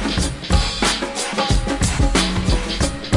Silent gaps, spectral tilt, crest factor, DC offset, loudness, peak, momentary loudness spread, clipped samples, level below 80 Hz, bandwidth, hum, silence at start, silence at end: none; -4 dB/octave; 16 dB; under 0.1%; -19 LUFS; -2 dBFS; 4 LU; under 0.1%; -24 dBFS; 11.5 kHz; none; 0 s; 0 s